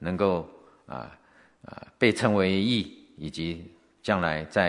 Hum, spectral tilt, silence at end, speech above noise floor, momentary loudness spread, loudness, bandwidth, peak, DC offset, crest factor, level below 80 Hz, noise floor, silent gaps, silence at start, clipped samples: none; -6 dB/octave; 0 s; 26 dB; 23 LU; -26 LUFS; 11 kHz; -6 dBFS; under 0.1%; 22 dB; -60 dBFS; -52 dBFS; none; 0 s; under 0.1%